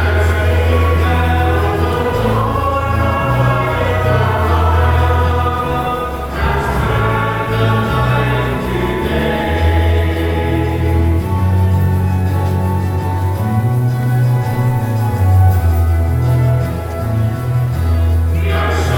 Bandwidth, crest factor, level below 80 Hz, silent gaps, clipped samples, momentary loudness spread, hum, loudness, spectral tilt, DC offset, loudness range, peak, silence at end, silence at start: 17 kHz; 12 dB; -22 dBFS; none; under 0.1%; 4 LU; none; -15 LUFS; -7.5 dB/octave; under 0.1%; 1 LU; -2 dBFS; 0 s; 0 s